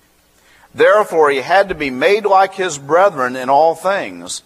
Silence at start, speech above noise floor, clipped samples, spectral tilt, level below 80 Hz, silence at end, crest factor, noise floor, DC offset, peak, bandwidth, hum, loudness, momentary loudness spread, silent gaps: 0.75 s; 39 dB; under 0.1%; -3.5 dB/octave; -52 dBFS; 0.05 s; 14 dB; -53 dBFS; under 0.1%; 0 dBFS; 14.5 kHz; none; -14 LUFS; 7 LU; none